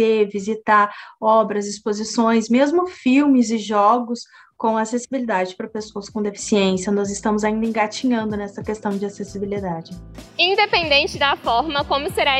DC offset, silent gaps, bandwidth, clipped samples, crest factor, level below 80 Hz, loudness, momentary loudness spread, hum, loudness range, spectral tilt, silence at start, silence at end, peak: under 0.1%; none; 13 kHz; under 0.1%; 16 dB; -48 dBFS; -19 LUFS; 12 LU; none; 5 LU; -4 dB/octave; 0 s; 0 s; -2 dBFS